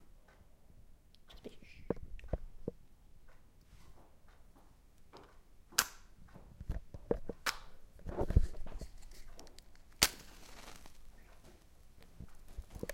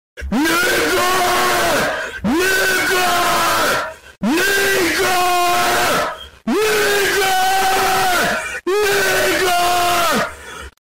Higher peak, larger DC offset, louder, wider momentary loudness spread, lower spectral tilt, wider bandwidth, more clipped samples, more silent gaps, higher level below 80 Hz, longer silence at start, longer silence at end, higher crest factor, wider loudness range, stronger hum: about the same, -6 dBFS vs -6 dBFS; second, under 0.1% vs 2%; second, -38 LUFS vs -15 LUFS; first, 27 LU vs 7 LU; about the same, -3 dB/octave vs -2 dB/octave; about the same, 16.5 kHz vs 16.5 kHz; neither; neither; second, -46 dBFS vs -40 dBFS; second, 0 s vs 0.15 s; about the same, 0 s vs 0.05 s; first, 36 dB vs 10 dB; first, 11 LU vs 1 LU; neither